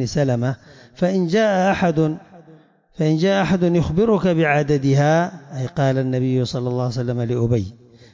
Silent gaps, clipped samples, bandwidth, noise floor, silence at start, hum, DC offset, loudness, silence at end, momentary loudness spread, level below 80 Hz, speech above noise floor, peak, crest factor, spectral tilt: none; under 0.1%; 7.6 kHz; -49 dBFS; 0 s; none; under 0.1%; -19 LUFS; 0.4 s; 7 LU; -44 dBFS; 31 dB; -6 dBFS; 12 dB; -7 dB/octave